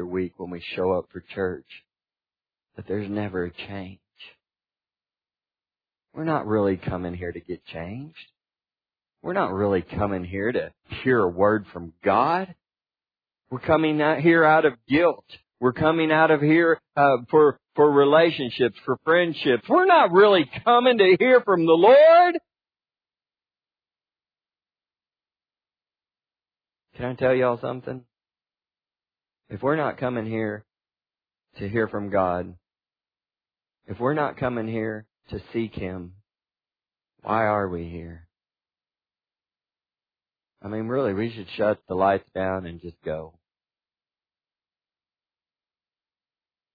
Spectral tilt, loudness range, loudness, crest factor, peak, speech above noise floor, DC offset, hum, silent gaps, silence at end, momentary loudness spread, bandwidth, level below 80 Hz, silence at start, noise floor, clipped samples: -9 dB/octave; 16 LU; -21 LUFS; 20 dB; -4 dBFS; over 68 dB; under 0.1%; none; none; 3.45 s; 19 LU; 5 kHz; -58 dBFS; 0 s; under -90 dBFS; under 0.1%